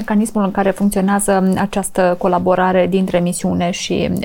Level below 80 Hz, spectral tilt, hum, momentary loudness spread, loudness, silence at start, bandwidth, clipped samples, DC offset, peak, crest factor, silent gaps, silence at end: -40 dBFS; -5.5 dB/octave; none; 4 LU; -16 LUFS; 0 s; 17 kHz; under 0.1%; under 0.1%; -2 dBFS; 14 dB; none; 0 s